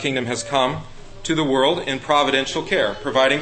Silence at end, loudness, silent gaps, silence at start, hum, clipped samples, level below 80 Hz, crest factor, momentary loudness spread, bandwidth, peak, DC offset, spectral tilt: 0 s; -20 LUFS; none; 0 s; none; under 0.1%; -44 dBFS; 18 dB; 6 LU; 8.8 kHz; -4 dBFS; under 0.1%; -4 dB/octave